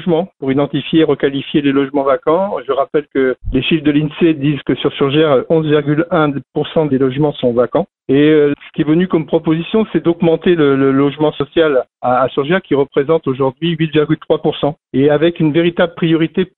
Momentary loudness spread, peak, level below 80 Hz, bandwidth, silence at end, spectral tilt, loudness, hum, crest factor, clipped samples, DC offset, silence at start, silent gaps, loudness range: 5 LU; 0 dBFS; -40 dBFS; 4.2 kHz; 0.1 s; -11.5 dB/octave; -14 LUFS; none; 14 dB; under 0.1%; under 0.1%; 0 s; none; 1 LU